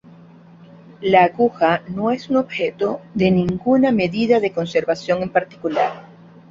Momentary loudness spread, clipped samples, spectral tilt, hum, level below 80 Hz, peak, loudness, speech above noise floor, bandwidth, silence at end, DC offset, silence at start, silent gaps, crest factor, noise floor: 8 LU; under 0.1%; -7 dB/octave; none; -54 dBFS; -2 dBFS; -19 LUFS; 26 dB; 7.6 kHz; 0.5 s; under 0.1%; 1 s; none; 18 dB; -44 dBFS